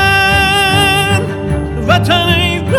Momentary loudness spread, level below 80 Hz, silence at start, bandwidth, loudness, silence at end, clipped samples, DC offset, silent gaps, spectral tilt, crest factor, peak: 8 LU; -28 dBFS; 0 s; 17.5 kHz; -11 LUFS; 0 s; under 0.1%; under 0.1%; none; -4.5 dB/octave; 12 dB; 0 dBFS